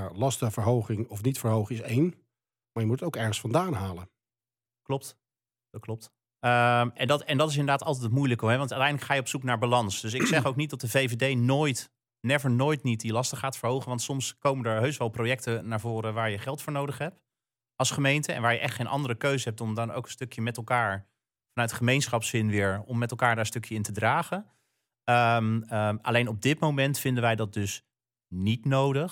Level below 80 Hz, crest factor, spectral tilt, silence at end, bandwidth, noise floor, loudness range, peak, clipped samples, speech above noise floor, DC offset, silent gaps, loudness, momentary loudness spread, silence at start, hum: -68 dBFS; 18 dB; -5 dB/octave; 0 s; 17.5 kHz; under -90 dBFS; 4 LU; -10 dBFS; under 0.1%; over 63 dB; under 0.1%; none; -28 LUFS; 9 LU; 0 s; none